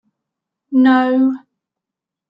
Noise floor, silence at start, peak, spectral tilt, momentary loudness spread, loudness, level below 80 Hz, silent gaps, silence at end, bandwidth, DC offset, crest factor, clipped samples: -85 dBFS; 0.7 s; -2 dBFS; -6.5 dB/octave; 8 LU; -14 LUFS; -68 dBFS; none; 0.9 s; 5.2 kHz; under 0.1%; 14 dB; under 0.1%